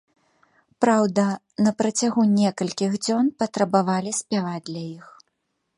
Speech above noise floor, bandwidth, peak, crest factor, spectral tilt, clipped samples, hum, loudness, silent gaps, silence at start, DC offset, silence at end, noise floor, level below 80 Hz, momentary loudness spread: 53 dB; 11.5 kHz; -4 dBFS; 20 dB; -5 dB/octave; under 0.1%; none; -22 LUFS; none; 0.8 s; under 0.1%; 0.75 s; -75 dBFS; -68 dBFS; 11 LU